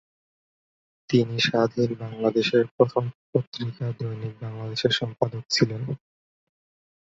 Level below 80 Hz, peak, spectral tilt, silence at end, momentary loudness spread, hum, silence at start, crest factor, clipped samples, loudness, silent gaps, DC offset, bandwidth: -62 dBFS; -4 dBFS; -5.5 dB/octave; 1.1 s; 11 LU; none; 1.1 s; 22 dB; under 0.1%; -25 LUFS; 2.71-2.78 s, 3.15-3.33 s, 3.47-3.52 s; under 0.1%; 7.8 kHz